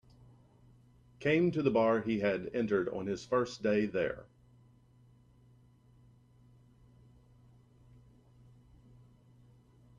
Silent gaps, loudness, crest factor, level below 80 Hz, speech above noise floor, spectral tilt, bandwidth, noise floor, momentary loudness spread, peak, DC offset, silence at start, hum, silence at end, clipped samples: none; -32 LUFS; 20 dB; -66 dBFS; 32 dB; -7 dB/octave; 9.6 kHz; -63 dBFS; 8 LU; -16 dBFS; under 0.1%; 1.2 s; none; 5.75 s; under 0.1%